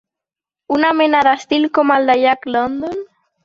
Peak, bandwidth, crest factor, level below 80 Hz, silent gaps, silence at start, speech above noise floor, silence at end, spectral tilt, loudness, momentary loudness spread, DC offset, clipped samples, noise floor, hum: -2 dBFS; 7.6 kHz; 14 dB; -56 dBFS; none; 0.7 s; 72 dB; 0.4 s; -4.5 dB/octave; -15 LUFS; 10 LU; under 0.1%; under 0.1%; -87 dBFS; none